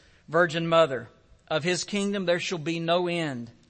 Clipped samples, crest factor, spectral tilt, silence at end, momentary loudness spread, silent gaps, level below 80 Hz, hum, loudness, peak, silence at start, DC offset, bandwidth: under 0.1%; 18 dB; -4.5 dB/octave; 0.2 s; 8 LU; none; -64 dBFS; none; -26 LUFS; -8 dBFS; 0.3 s; under 0.1%; 8.8 kHz